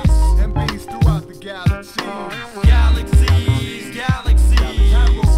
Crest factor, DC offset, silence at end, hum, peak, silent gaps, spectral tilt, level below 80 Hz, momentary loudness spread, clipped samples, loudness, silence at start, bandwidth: 14 dB; under 0.1%; 0 s; none; 0 dBFS; none; -6 dB/octave; -16 dBFS; 11 LU; under 0.1%; -17 LUFS; 0 s; 12.5 kHz